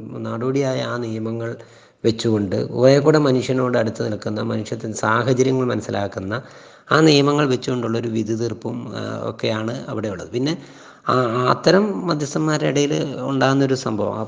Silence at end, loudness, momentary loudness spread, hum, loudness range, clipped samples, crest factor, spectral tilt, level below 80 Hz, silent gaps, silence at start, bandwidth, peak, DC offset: 0 s; -20 LUFS; 12 LU; none; 5 LU; under 0.1%; 20 dB; -6 dB/octave; -60 dBFS; none; 0 s; 10 kHz; 0 dBFS; under 0.1%